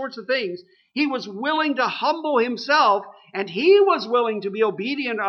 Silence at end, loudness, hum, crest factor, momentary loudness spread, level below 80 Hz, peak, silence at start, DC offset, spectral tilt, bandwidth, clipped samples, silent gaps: 0 s; -21 LUFS; none; 16 dB; 12 LU; -78 dBFS; -6 dBFS; 0 s; under 0.1%; -5 dB/octave; 6.6 kHz; under 0.1%; none